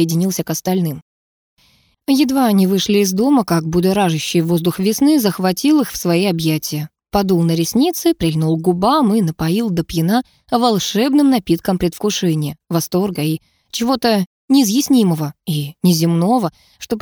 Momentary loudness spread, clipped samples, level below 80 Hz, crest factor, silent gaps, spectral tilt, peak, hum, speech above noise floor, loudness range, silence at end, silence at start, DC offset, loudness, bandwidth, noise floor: 8 LU; under 0.1%; -46 dBFS; 14 dB; 1.02-1.57 s, 14.27-14.48 s; -5.5 dB/octave; -2 dBFS; none; 41 dB; 2 LU; 0 s; 0 s; under 0.1%; -16 LUFS; over 20 kHz; -56 dBFS